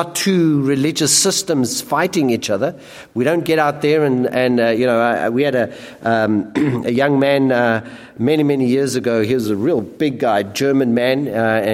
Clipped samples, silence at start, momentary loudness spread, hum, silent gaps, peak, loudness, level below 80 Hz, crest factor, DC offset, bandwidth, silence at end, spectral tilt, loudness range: under 0.1%; 0 s; 6 LU; none; none; 0 dBFS; -16 LUFS; -58 dBFS; 16 dB; under 0.1%; 16.5 kHz; 0 s; -4.5 dB/octave; 1 LU